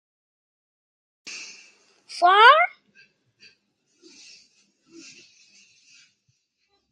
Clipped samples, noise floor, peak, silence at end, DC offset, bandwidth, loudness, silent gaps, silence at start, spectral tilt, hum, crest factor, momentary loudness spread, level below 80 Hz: under 0.1%; -72 dBFS; -4 dBFS; 4.25 s; under 0.1%; 10.5 kHz; -16 LUFS; none; 1.25 s; 0.5 dB/octave; none; 22 dB; 26 LU; under -90 dBFS